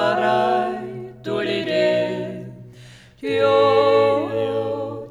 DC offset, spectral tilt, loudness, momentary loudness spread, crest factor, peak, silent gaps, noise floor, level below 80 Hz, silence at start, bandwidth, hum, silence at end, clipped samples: under 0.1%; -6 dB/octave; -20 LUFS; 16 LU; 16 dB; -4 dBFS; none; -44 dBFS; -60 dBFS; 0 s; 11 kHz; none; 0 s; under 0.1%